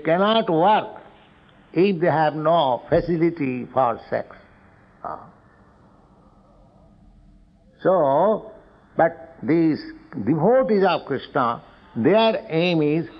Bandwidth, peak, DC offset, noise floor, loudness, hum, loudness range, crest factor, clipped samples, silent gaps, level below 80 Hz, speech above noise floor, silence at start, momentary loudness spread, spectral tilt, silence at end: 6 kHz; -6 dBFS; under 0.1%; -53 dBFS; -21 LUFS; none; 9 LU; 16 dB; under 0.1%; none; -54 dBFS; 33 dB; 0 s; 15 LU; -9 dB/octave; 0 s